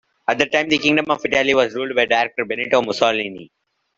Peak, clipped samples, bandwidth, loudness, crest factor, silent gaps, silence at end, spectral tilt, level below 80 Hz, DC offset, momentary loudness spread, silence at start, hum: 0 dBFS; under 0.1%; 7.8 kHz; -18 LUFS; 20 dB; none; 0.5 s; -3.5 dB/octave; -58 dBFS; under 0.1%; 7 LU; 0.3 s; none